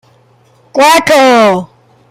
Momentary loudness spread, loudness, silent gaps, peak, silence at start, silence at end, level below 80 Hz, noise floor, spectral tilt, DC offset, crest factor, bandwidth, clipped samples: 11 LU; -7 LUFS; none; 0 dBFS; 0.75 s; 0.45 s; -50 dBFS; -47 dBFS; -3.5 dB/octave; under 0.1%; 10 dB; 16.5 kHz; under 0.1%